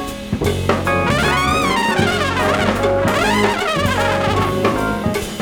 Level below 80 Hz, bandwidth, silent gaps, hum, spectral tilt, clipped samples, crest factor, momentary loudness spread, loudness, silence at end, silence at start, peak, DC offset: -34 dBFS; over 20 kHz; none; none; -5 dB/octave; under 0.1%; 16 dB; 4 LU; -17 LUFS; 0 s; 0 s; -2 dBFS; under 0.1%